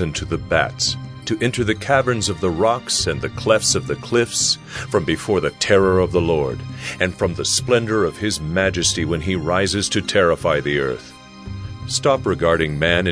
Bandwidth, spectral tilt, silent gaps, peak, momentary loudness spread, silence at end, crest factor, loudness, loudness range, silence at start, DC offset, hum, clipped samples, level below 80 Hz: 11 kHz; -4 dB/octave; none; 0 dBFS; 8 LU; 0 s; 18 dB; -19 LUFS; 1 LU; 0 s; under 0.1%; none; under 0.1%; -40 dBFS